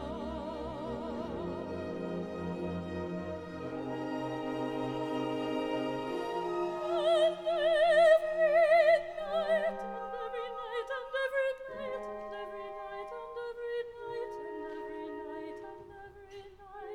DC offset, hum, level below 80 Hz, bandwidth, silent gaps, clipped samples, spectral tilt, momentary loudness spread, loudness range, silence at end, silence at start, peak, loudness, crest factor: under 0.1%; none; -60 dBFS; 10 kHz; none; under 0.1%; -6 dB/octave; 16 LU; 14 LU; 0 s; 0 s; -14 dBFS; -33 LUFS; 20 dB